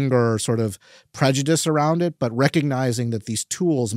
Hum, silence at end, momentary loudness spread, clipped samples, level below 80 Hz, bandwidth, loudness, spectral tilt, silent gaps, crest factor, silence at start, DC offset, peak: none; 0 s; 7 LU; under 0.1%; -64 dBFS; 16 kHz; -21 LUFS; -5.5 dB/octave; none; 20 dB; 0 s; under 0.1%; -2 dBFS